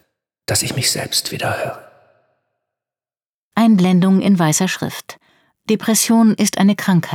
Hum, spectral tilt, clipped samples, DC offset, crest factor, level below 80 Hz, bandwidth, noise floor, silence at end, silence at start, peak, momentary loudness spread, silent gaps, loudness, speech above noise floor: none; -4.5 dB/octave; under 0.1%; under 0.1%; 14 dB; -60 dBFS; 18.5 kHz; under -90 dBFS; 0 s; 0.5 s; -2 dBFS; 13 LU; 3.29-3.51 s; -16 LUFS; over 75 dB